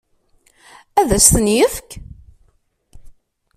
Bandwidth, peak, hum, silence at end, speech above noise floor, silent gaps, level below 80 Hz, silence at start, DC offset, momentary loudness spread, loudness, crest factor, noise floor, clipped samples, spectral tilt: 16 kHz; 0 dBFS; none; 0.45 s; 45 dB; none; -34 dBFS; 0.95 s; under 0.1%; 24 LU; -13 LUFS; 20 dB; -60 dBFS; under 0.1%; -3.5 dB/octave